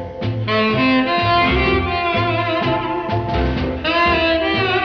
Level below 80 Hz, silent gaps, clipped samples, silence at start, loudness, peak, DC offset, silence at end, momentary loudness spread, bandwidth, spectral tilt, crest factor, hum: -30 dBFS; none; under 0.1%; 0 s; -17 LUFS; -4 dBFS; under 0.1%; 0 s; 6 LU; 6.6 kHz; -7.5 dB/octave; 12 dB; none